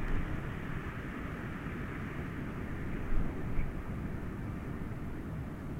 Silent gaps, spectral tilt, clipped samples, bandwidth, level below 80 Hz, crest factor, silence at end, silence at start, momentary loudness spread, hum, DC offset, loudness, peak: none; -8 dB/octave; under 0.1%; 9.4 kHz; -40 dBFS; 16 dB; 0 s; 0 s; 3 LU; none; under 0.1%; -40 LUFS; -20 dBFS